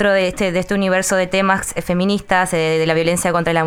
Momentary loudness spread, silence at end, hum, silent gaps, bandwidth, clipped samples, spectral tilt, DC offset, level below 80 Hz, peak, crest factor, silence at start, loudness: 3 LU; 0 s; none; none; 17 kHz; under 0.1%; -4.5 dB/octave; under 0.1%; -42 dBFS; -2 dBFS; 14 dB; 0 s; -17 LUFS